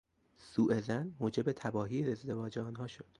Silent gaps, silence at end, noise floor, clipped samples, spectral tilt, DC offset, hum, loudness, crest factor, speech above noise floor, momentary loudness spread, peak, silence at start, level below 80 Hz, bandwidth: none; 0.2 s; -62 dBFS; under 0.1%; -7.5 dB/octave; under 0.1%; none; -37 LUFS; 18 dB; 26 dB; 9 LU; -20 dBFS; 0.4 s; -68 dBFS; 11 kHz